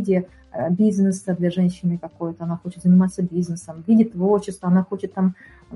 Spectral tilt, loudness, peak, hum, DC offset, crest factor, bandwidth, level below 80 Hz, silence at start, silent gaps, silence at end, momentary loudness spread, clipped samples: -8.5 dB/octave; -21 LUFS; -6 dBFS; none; under 0.1%; 14 dB; 11.5 kHz; -56 dBFS; 0 s; none; 0 s; 11 LU; under 0.1%